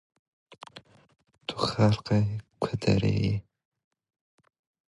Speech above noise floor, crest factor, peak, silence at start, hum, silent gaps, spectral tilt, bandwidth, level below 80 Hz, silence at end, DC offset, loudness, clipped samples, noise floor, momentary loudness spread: 27 dB; 20 dB; -10 dBFS; 0.75 s; none; none; -7 dB/octave; 11 kHz; -50 dBFS; 1.5 s; under 0.1%; -27 LUFS; under 0.1%; -52 dBFS; 19 LU